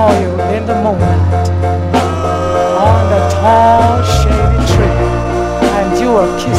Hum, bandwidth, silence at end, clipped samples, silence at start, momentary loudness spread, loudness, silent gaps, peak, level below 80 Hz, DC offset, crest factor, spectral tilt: none; 13.5 kHz; 0 s; 0.1%; 0 s; 6 LU; -11 LUFS; none; 0 dBFS; -20 dBFS; under 0.1%; 10 dB; -6.5 dB/octave